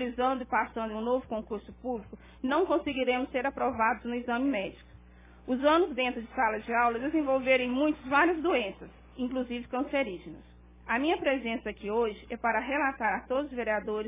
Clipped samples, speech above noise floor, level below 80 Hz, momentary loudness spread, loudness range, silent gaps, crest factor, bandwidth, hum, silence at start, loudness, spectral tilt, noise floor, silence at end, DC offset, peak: under 0.1%; 24 dB; -56 dBFS; 12 LU; 4 LU; none; 18 dB; 3.8 kHz; none; 0 s; -30 LUFS; -2.5 dB/octave; -54 dBFS; 0 s; under 0.1%; -12 dBFS